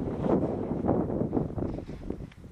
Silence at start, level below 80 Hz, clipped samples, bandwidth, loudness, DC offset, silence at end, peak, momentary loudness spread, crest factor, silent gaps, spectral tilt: 0 s; -44 dBFS; under 0.1%; 9.6 kHz; -31 LUFS; under 0.1%; 0 s; -10 dBFS; 11 LU; 20 dB; none; -10.5 dB/octave